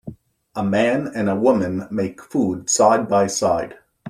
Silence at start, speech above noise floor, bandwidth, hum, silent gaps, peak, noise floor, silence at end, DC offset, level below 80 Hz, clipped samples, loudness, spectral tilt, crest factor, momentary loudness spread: 0.05 s; 20 dB; 15 kHz; none; none; -2 dBFS; -39 dBFS; 0 s; under 0.1%; -56 dBFS; under 0.1%; -19 LUFS; -4.5 dB/octave; 18 dB; 10 LU